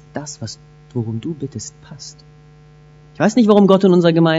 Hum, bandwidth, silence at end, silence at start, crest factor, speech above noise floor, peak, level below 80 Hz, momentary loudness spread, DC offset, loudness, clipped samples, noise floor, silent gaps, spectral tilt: none; 8 kHz; 0 s; 0.15 s; 16 dB; 29 dB; 0 dBFS; -54 dBFS; 24 LU; under 0.1%; -14 LUFS; under 0.1%; -45 dBFS; none; -6.5 dB/octave